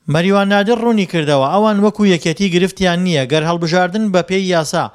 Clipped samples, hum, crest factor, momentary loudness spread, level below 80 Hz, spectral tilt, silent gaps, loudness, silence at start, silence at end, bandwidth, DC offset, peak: under 0.1%; none; 14 dB; 3 LU; -48 dBFS; -5.5 dB/octave; none; -14 LUFS; 0.05 s; 0.05 s; 13 kHz; under 0.1%; 0 dBFS